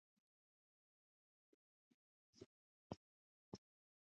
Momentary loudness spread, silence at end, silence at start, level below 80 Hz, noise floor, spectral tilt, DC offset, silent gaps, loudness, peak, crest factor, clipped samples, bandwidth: 8 LU; 0.5 s; 2.35 s; -84 dBFS; under -90 dBFS; -6.5 dB/octave; under 0.1%; 2.46-2.90 s, 2.97-3.52 s; -62 LUFS; -34 dBFS; 32 dB; under 0.1%; 7.2 kHz